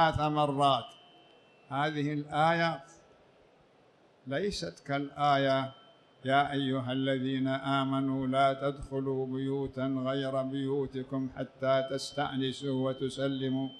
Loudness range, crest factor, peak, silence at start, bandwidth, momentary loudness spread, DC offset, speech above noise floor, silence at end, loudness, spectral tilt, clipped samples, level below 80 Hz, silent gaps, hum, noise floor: 3 LU; 18 dB; -14 dBFS; 0 s; 11 kHz; 9 LU; under 0.1%; 32 dB; 0 s; -31 LUFS; -6 dB/octave; under 0.1%; -60 dBFS; none; none; -63 dBFS